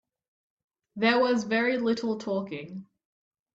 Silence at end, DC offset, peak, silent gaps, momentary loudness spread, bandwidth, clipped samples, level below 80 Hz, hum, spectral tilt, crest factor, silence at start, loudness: 0.7 s; under 0.1%; -12 dBFS; none; 19 LU; 7.8 kHz; under 0.1%; -72 dBFS; none; -5 dB/octave; 18 dB; 0.95 s; -27 LUFS